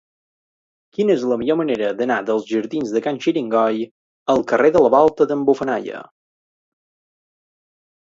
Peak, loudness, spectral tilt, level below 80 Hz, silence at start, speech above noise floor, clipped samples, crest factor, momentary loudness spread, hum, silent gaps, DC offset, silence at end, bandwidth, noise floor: 0 dBFS; -18 LUFS; -6 dB/octave; -60 dBFS; 1 s; over 72 dB; under 0.1%; 20 dB; 12 LU; none; 3.91-4.26 s; under 0.1%; 2.15 s; 7.6 kHz; under -90 dBFS